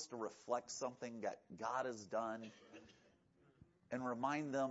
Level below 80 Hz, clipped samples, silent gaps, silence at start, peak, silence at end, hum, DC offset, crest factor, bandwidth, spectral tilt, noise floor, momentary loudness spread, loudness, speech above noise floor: -84 dBFS; under 0.1%; none; 0 s; -26 dBFS; 0 s; none; under 0.1%; 18 dB; 7.6 kHz; -4 dB/octave; -73 dBFS; 13 LU; -44 LUFS; 29 dB